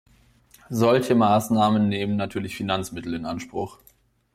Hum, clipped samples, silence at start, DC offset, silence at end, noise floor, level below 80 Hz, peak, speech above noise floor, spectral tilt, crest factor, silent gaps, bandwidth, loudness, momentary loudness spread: none; under 0.1%; 0.7 s; under 0.1%; 0.65 s; -56 dBFS; -56 dBFS; -8 dBFS; 34 dB; -6 dB/octave; 16 dB; none; 15.5 kHz; -23 LUFS; 12 LU